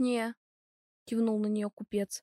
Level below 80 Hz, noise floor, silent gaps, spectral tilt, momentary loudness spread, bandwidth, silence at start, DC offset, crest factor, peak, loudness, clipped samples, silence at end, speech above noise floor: -74 dBFS; under -90 dBFS; 0.37-1.06 s, 1.73-1.77 s; -5.5 dB/octave; 8 LU; 13.5 kHz; 0 s; under 0.1%; 14 dB; -20 dBFS; -33 LUFS; under 0.1%; 0.05 s; over 59 dB